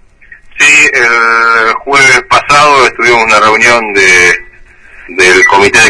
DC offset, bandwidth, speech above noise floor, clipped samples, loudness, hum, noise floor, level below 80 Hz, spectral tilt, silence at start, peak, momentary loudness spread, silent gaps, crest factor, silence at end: under 0.1%; 11 kHz; 30 dB; 4%; -4 LUFS; none; -35 dBFS; -38 dBFS; -1.5 dB/octave; 0.55 s; 0 dBFS; 4 LU; none; 6 dB; 0 s